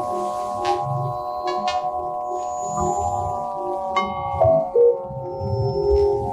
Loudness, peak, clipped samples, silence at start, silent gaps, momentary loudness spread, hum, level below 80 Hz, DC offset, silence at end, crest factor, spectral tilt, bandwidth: -22 LUFS; -8 dBFS; under 0.1%; 0 s; none; 9 LU; none; -40 dBFS; under 0.1%; 0 s; 14 dB; -6 dB/octave; 12.5 kHz